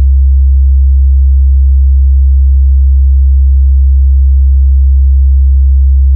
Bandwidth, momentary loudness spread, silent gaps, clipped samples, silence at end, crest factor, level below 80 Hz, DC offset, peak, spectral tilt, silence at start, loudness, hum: 0.2 kHz; 0 LU; none; under 0.1%; 0 s; 4 dB; -4 dBFS; under 0.1%; -2 dBFS; -27.5 dB/octave; 0 s; -8 LUFS; none